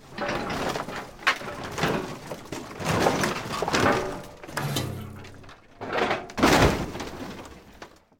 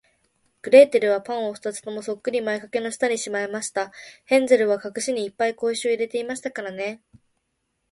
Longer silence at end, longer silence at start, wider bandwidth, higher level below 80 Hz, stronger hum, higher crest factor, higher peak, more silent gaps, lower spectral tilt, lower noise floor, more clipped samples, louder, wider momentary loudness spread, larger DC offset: second, 0.3 s vs 0.95 s; second, 0 s vs 0.65 s; first, 17.5 kHz vs 11.5 kHz; first, -44 dBFS vs -70 dBFS; neither; about the same, 24 dB vs 22 dB; about the same, -4 dBFS vs -2 dBFS; neither; first, -4.5 dB/octave vs -3 dB/octave; second, -48 dBFS vs -75 dBFS; neither; second, -26 LUFS vs -22 LUFS; first, 19 LU vs 15 LU; neither